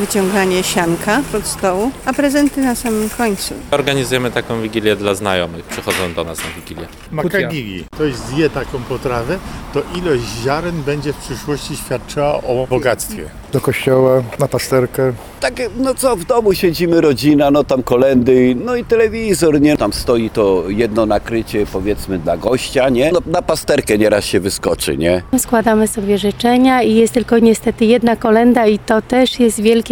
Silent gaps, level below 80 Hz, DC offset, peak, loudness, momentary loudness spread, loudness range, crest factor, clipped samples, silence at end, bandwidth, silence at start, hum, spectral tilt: none; -36 dBFS; under 0.1%; 0 dBFS; -15 LUFS; 10 LU; 7 LU; 14 dB; under 0.1%; 0 s; 19.5 kHz; 0 s; none; -5 dB/octave